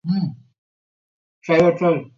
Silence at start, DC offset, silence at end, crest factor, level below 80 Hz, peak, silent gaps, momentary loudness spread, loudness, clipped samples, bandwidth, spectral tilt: 0.05 s; under 0.1%; 0.1 s; 18 dB; -58 dBFS; -4 dBFS; 0.58-1.41 s; 14 LU; -19 LUFS; under 0.1%; 7.6 kHz; -8 dB/octave